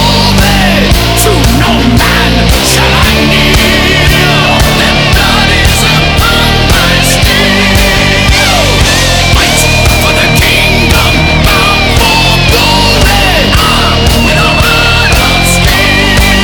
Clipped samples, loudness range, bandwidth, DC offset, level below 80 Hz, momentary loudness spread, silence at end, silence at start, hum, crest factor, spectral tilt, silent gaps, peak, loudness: 2%; 0 LU; over 20 kHz; under 0.1%; -12 dBFS; 1 LU; 0 s; 0 s; none; 6 dB; -3.5 dB/octave; none; 0 dBFS; -5 LUFS